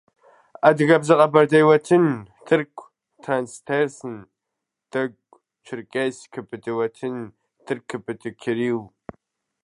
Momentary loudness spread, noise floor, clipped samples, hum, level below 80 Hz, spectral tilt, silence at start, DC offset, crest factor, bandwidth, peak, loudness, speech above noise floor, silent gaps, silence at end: 20 LU; -83 dBFS; under 0.1%; none; -68 dBFS; -6.5 dB/octave; 0.65 s; under 0.1%; 22 dB; 11.5 kHz; 0 dBFS; -21 LUFS; 62 dB; none; 0.8 s